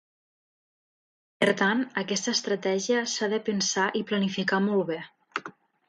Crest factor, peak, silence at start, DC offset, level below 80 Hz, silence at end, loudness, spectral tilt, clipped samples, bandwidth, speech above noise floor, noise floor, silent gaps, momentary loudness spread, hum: 18 dB; -10 dBFS; 1.4 s; under 0.1%; -74 dBFS; 0.4 s; -27 LUFS; -3.5 dB/octave; under 0.1%; 11.5 kHz; 20 dB; -46 dBFS; none; 12 LU; none